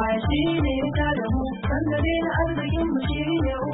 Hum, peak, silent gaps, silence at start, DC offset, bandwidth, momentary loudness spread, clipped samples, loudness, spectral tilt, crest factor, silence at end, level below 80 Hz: none; -12 dBFS; none; 0 s; under 0.1%; 4 kHz; 3 LU; under 0.1%; -24 LUFS; -11.5 dB/octave; 12 dB; 0 s; -32 dBFS